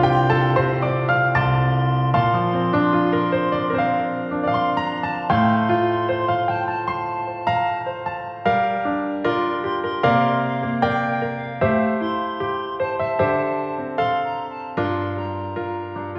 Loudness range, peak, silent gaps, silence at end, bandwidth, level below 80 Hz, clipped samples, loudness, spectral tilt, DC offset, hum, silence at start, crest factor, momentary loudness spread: 4 LU; -6 dBFS; none; 0 s; 6 kHz; -48 dBFS; under 0.1%; -21 LUFS; -9 dB/octave; under 0.1%; none; 0 s; 16 dB; 8 LU